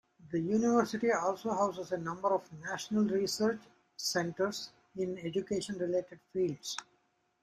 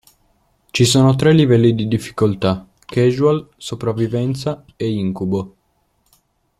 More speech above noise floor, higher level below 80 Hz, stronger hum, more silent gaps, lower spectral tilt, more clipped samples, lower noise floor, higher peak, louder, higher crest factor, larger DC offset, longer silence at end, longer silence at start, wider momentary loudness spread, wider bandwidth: second, 41 dB vs 48 dB; second, -72 dBFS vs -50 dBFS; neither; neither; second, -4.5 dB/octave vs -6 dB/octave; neither; first, -75 dBFS vs -64 dBFS; second, -14 dBFS vs -2 dBFS; second, -34 LUFS vs -17 LUFS; about the same, 20 dB vs 16 dB; neither; second, 0.6 s vs 1.1 s; second, 0.2 s vs 0.75 s; about the same, 11 LU vs 12 LU; about the same, 14.5 kHz vs 14.5 kHz